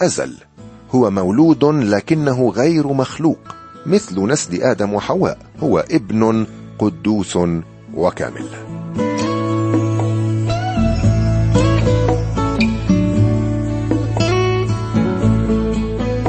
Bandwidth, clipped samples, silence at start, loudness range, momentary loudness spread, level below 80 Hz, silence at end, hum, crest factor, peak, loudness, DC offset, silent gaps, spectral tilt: 8.8 kHz; under 0.1%; 0 s; 4 LU; 7 LU; -30 dBFS; 0 s; none; 14 dB; -2 dBFS; -17 LUFS; under 0.1%; none; -6.5 dB/octave